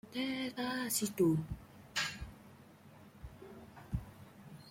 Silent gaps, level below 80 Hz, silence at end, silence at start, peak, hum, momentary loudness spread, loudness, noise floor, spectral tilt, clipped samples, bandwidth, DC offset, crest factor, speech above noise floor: none; -56 dBFS; 0 s; 0.05 s; -20 dBFS; none; 25 LU; -37 LUFS; -58 dBFS; -4 dB/octave; under 0.1%; 16.5 kHz; under 0.1%; 20 dB; 23 dB